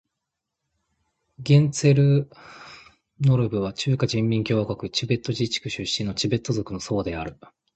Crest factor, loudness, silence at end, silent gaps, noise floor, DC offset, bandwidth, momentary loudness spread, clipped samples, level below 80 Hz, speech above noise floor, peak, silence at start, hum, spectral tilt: 18 dB; -23 LUFS; 0.45 s; none; -83 dBFS; under 0.1%; 8.8 kHz; 17 LU; under 0.1%; -52 dBFS; 60 dB; -6 dBFS; 1.4 s; none; -6 dB/octave